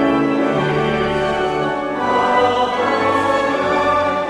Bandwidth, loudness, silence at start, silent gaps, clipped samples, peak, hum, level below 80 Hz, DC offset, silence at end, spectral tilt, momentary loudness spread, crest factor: 12 kHz; -17 LUFS; 0 s; none; under 0.1%; -4 dBFS; none; -44 dBFS; under 0.1%; 0 s; -6 dB/octave; 4 LU; 12 dB